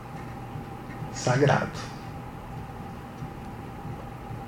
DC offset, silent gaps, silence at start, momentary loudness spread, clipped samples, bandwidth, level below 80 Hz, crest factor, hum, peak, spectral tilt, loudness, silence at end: under 0.1%; none; 0 s; 16 LU; under 0.1%; 16.5 kHz; -48 dBFS; 24 dB; none; -8 dBFS; -6 dB/octave; -31 LUFS; 0 s